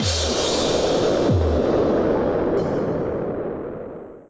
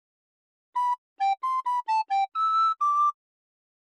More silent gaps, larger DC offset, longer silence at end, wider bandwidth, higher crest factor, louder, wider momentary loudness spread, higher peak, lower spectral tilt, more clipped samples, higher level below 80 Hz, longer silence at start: second, none vs 0.98-1.16 s; neither; second, 0.1 s vs 0.85 s; second, 8 kHz vs 11.5 kHz; about the same, 10 dB vs 10 dB; first, -21 LUFS vs -26 LUFS; first, 10 LU vs 6 LU; first, -10 dBFS vs -18 dBFS; first, -5 dB/octave vs 4 dB/octave; neither; first, -34 dBFS vs under -90 dBFS; second, 0 s vs 0.75 s